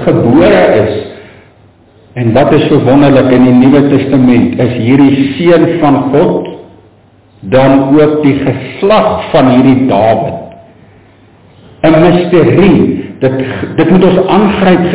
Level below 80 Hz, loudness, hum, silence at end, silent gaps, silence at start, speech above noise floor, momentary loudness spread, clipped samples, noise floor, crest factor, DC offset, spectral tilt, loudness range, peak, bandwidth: -36 dBFS; -7 LUFS; none; 0 s; none; 0 s; 36 dB; 9 LU; 0.9%; -42 dBFS; 8 dB; 0.9%; -11.5 dB/octave; 3 LU; 0 dBFS; 4 kHz